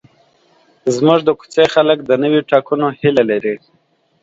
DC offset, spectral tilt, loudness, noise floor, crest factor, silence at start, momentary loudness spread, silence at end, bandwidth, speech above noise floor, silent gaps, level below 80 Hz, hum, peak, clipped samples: under 0.1%; -6 dB/octave; -14 LUFS; -59 dBFS; 16 dB; 0.85 s; 8 LU; 0.65 s; 8 kHz; 45 dB; none; -58 dBFS; none; 0 dBFS; under 0.1%